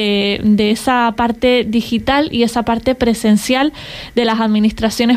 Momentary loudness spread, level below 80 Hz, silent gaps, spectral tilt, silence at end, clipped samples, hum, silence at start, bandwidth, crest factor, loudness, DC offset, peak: 4 LU; -38 dBFS; none; -5 dB/octave; 0 s; under 0.1%; none; 0 s; 15.5 kHz; 12 dB; -15 LUFS; under 0.1%; -2 dBFS